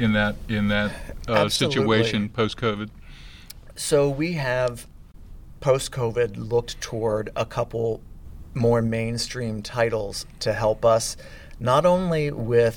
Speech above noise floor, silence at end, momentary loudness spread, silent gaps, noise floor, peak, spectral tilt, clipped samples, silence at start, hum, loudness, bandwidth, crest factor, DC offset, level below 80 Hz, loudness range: 20 dB; 0 s; 12 LU; none; -43 dBFS; -6 dBFS; -5 dB/octave; under 0.1%; 0 s; none; -24 LUFS; 18 kHz; 18 dB; under 0.1%; -42 dBFS; 3 LU